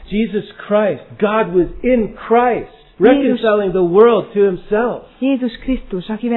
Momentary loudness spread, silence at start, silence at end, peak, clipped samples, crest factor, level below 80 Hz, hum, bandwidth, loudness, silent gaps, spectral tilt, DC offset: 10 LU; 0 s; 0 s; 0 dBFS; under 0.1%; 16 dB; -38 dBFS; none; 4.2 kHz; -16 LUFS; none; -10.5 dB/octave; under 0.1%